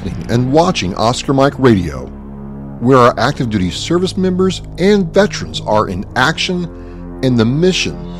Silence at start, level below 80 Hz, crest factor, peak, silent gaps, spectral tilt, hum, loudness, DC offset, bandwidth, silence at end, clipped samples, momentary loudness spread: 0 s; -32 dBFS; 14 dB; 0 dBFS; none; -5.5 dB/octave; none; -14 LUFS; under 0.1%; 13.5 kHz; 0 s; under 0.1%; 16 LU